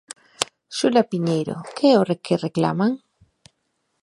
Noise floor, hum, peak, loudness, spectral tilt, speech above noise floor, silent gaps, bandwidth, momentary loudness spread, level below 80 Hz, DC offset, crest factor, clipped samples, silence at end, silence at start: -73 dBFS; none; 0 dBFS; -21 LUFS; -5.5 dB/octave; 53 dB; none; 13 kHz; 10 LU; -64 dBFS; under 0.1%; 22 dB; under 0.1%; 1.05 s; 0.4 s